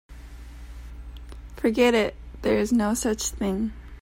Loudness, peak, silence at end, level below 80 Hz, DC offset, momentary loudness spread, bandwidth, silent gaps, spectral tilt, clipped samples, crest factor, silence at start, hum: -24 LUFS; -8 dBFS; 0 s; -40 dBFS; under 0.1%; 23 LU; 16 kHz; none; -4.5 dB/octave; under 0.1%; 18 dB; 0.1 s; none